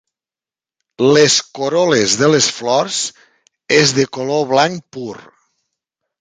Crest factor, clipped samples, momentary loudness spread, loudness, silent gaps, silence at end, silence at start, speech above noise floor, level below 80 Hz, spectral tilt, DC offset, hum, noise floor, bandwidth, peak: 16 dB; under 0.1%; 13 LU; -14 LUFS; none; 1.05 s; 1 s; over 76 dB; -58 dBFS; -3 dB/octave; under 0.1%; none; under -90 dBFS; 9.6 kHz; 0 dBFS